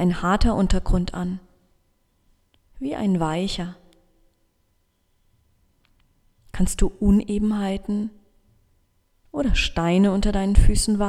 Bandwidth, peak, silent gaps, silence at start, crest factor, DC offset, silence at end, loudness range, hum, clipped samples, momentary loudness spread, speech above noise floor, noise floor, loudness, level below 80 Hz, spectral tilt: 13.5 kHz; -2 dBFS; none; 0 s; 22 dB; under 0.1%; 0 s; 9 LU; none; under 0.1%; 11 LU; 47 dB; -67 dBFS; -23 LUFS; -28 dBFS; -5.5 dB/octave